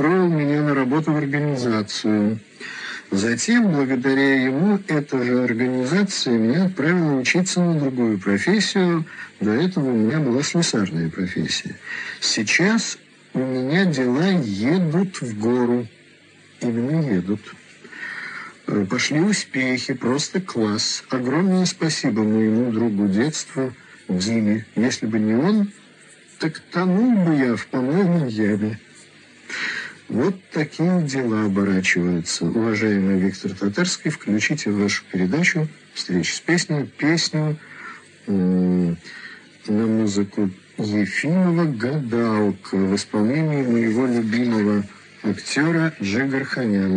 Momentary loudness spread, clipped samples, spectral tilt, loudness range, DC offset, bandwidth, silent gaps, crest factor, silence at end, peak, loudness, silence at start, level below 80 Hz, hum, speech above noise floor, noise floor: 9 LU; under 0.1%; -5 dB/octave; 3 LU; under 0.1%; 10 kHz; none; 16 dB; 0 s; -4 dBFS; -21 LUFS; 0 s; -66 dBFS; none; 30 dB; -50 dBFS